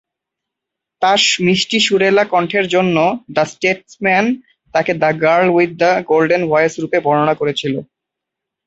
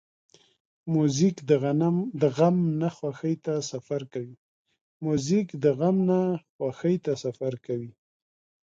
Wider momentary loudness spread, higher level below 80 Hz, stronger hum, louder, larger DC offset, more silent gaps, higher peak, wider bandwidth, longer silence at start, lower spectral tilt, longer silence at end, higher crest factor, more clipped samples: second, 6 LU vs 11 LU; first, -58 dBFS vs -68 dBFS; neither; first, -14 LUFS vs -26 LUFS; neither; second, none vs 4.38-4.65 s, 4.81-5.00 s, 6.49-6.59 s; first, 0 dBFS vs -8 dBFS; about the same, 8.2 kHz vs 7.8 kHz; first, 1 s vs 0.85 s; second, -4 dB/octave vs -7 dB/octave; about the same, 0.85 s vs 0.75 s; about the same, 14 dB vs 18 dB; neither